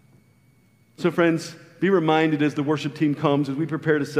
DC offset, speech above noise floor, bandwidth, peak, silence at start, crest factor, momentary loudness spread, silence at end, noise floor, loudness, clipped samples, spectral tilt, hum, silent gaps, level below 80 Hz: under 0.1%; 37 dB; 13.5 kHz; -6 dBFS; 1 s; 18 dB; 7 LU; 0 s; -58 dBFS; -22 LUFS; under 0.1%; -6.5 dB/octave; none; none; -70 dBFS